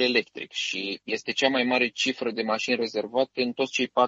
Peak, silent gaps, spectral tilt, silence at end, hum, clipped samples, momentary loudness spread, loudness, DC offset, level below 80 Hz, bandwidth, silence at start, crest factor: -6 dBFS; none; -3 dB/octave; 0 s; none; under 0.1%; 7 LU; -26 LUFS; under 0.1%; -74 dBFS; 8 kHz; 0 s; 20 dB